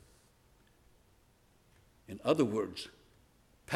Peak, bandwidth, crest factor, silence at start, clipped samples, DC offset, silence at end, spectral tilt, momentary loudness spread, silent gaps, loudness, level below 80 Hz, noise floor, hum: -14 dBFS; 15.5 kHz; 26 dB; 2.1 s; under 0.1%; under 0.1%; 0 s; -6 dB/octave; 19 LU; none; -34 LUFS; -70 dBFS; -67 dBFS; none